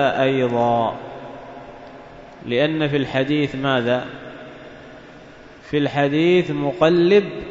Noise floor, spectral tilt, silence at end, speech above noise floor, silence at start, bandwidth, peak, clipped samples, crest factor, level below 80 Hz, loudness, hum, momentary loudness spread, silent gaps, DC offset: -42 dBFS; -7 dB/octave; 0 s; 24 dB; 0 s; 7.6 kHz; -2 dBFS; under 0.1%; 18 dB; -52 dBFS; -19 LUFS; none; 23 LU; none; under 0.1%